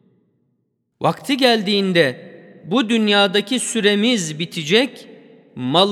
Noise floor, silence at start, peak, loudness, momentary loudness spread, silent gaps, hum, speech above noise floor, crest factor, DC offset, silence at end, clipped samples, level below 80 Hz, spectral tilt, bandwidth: -69 dBFS; 1 s; 0 dBFS; -17 LUFS; 9 LU; none; none; 52 dB; 18 dB; under 0.1%; 0 s; under 0.1%; -72 dBFS; -4 dB/octave; 15 kHz